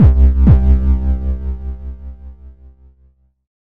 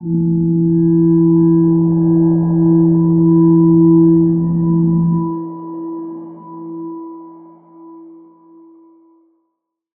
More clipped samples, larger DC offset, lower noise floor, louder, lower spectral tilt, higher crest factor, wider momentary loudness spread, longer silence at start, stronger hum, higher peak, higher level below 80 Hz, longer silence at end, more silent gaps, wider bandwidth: neither; neither; second, -53 dBFS vs -73 dBFS; about the same, -14 LUFS vs -12 LUFS; second, -11.5 dB/octave vs -16.5 dB/octave; about the same, 14 dB vs 12 dB; first, 22 LU vs 19 LU; about the same, 0 s vs 0 s; neither; about the same, 0 dBFS vs -2 dBFS; first, -16 dBFS vs -46 dBFS; second, 0.25 s vs 1.9 s; neither; first, 2.5 kHz vs 1.7 kHz